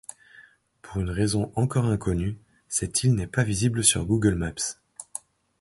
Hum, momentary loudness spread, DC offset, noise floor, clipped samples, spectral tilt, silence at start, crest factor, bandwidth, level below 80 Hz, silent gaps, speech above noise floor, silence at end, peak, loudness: none; 17 LU; under 0.1%; -54 dBFS; under 0.1%; -4.5 dB/octave; 0.4 s; 22 dB; 12 kHz; -42 dBFS; none; 30 dB; 0.6 s; -4 dBFS; -25 LUFS